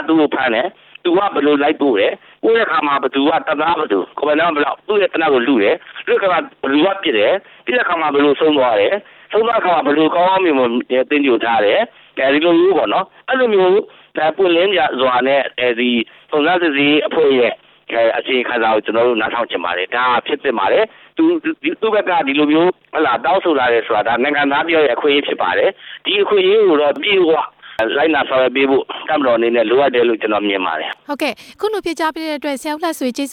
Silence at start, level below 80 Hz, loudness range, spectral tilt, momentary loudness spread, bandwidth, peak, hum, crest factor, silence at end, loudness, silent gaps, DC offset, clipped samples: 0 s; -58 dBFS; 2 LU; -5 dB/octave; 7 LU; 15 kHz; -2 dBFS; none; 12 dB; 0 s; -15 LUFS; none; under 0.1%; under 0.1%